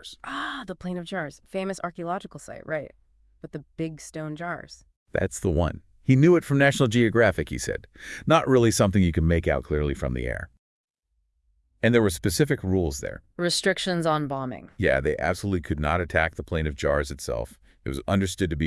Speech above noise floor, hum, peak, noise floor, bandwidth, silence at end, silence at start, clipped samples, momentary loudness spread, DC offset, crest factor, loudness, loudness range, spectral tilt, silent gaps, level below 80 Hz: 49 dB; none; -4 dBFS; -74 dBFS; 12 kHz; 0 s; 0.05 s; under 0.1%; 15 LU; under 0.1%; 20 dB; -25 LUFS; 12 LU; -5.5 dB/octave; 4.97-5.06 s, 10.59-11.03 s; -42 dBFS